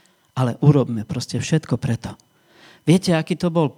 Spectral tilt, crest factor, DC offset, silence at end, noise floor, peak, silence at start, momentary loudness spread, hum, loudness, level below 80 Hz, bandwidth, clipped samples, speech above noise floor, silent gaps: -6.5 dB/octave; 18 dB; under 0.1%; 0.05 s; -51 dBFS; -2 dBFS; 0.35 s; 10 LU; none; -20 LUFS; -52 dBFS; 13.5 kHz; under 0.1%; 32 dB; none